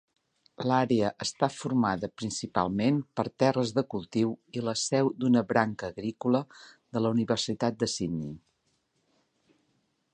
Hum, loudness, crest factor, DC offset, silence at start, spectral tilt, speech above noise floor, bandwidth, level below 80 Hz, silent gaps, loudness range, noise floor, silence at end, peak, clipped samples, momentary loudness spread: none; -29 LUFS; 22 dB; under 0.1%; 0.6 s; -5.5 dB/octave; 46 dB; 10 kHz; -62 dBFS; none; 4 LU; -74 dBFS; 1.75 s; -8 dBFS; under 0.1%; 9 LU